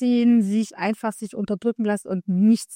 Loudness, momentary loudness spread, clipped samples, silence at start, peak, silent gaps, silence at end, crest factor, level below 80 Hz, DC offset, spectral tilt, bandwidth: -22 LUFS; 10 LU; under 0.1%; 0 s; -8 dBFS; none; 0 s; 12 dB; -66 dBFS; under 0.1%; -6.5 dB/octave; 14.5 kHz